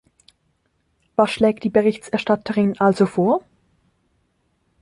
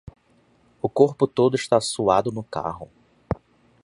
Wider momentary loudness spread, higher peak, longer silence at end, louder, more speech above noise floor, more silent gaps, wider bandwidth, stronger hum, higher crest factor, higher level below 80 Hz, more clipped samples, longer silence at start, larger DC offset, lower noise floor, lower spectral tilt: second, 5 LU vs 13 LU; about the same, -2 dBFS vs -2 dBFS; first, 1.45 s vs 0.5 s; first, -19 LUFS vs -23 LUFS; first, 49 dB vs 39 dB; neither; about the same, 11.5 kHz vs 11.5 kHz; neither; about the same, 20 dB vs 22 dB; second, -58 dBFS vs -50 dBFS; neither; first, 1.2 s vs 0.85 s; neither; first, -67 dBFS vs -60 dBFS; first, -7 dB/octave vs -5.5 dB/octave